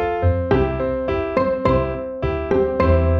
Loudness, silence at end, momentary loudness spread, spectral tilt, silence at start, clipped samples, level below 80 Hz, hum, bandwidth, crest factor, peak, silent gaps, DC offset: -20 LUFS; 0 s; 7 LU; -9.5 dB/octave; 0 s; under 0.1%; -28 dBFS; none; 6 kHz; 14 dB; -4 dBFS; none; under 0.1%